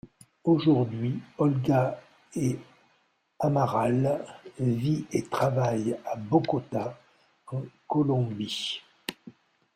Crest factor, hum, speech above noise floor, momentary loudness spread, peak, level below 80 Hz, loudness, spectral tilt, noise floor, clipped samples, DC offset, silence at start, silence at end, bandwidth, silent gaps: 20 dB; none; 43 dB; 13 LU; -8 dBFS; -64 dBFS; -28 LUFS; -7 dB/octave; -69 dBFS; under 0.1%; under 0.1%; 0.05 s; 0.45 s; 15.5 kHz; none